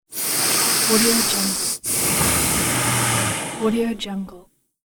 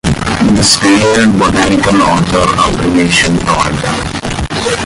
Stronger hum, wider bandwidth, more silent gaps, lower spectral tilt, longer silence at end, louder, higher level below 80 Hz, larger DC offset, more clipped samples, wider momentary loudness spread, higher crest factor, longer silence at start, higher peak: neither; first, over 20 kHz vs 16 kHz; neither; second, -2.5 dB/octave vs -4 dB/octave; first, 0.55 s vs 0 s; second, -18 LUFS vs -10 LUFS; second, -44 dBFS vs -26 dBFS; neither; neither; about the same, 9 LU vs 8 LU; first, 16 dB vs 10 dB; about the same, 0.1 s vs 0.05 s; second, -4 dBFS vs 0 dBFS